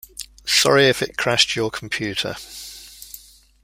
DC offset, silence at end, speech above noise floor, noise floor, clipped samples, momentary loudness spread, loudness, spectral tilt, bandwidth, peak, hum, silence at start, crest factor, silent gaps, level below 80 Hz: under 0.1%; 0.45 s; 24 dB; -44 dBFS; under 0.1%; 23 LU; -18 LUFS; -2.5 dB/octave; 16 kHz; -2 dBFS; none; 0.2 s; 20 dB; none; -52 dBFS